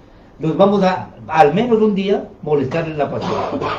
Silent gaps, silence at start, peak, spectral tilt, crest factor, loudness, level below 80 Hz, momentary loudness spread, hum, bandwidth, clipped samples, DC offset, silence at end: none; 0.4 s; 0 dBFS; -7.5 dB/octave; 16 dB; -17 LUFS; -48 dBFS; 8 LU; none; 7.6 kHz; under 0.1%; under 0.1%; 0 s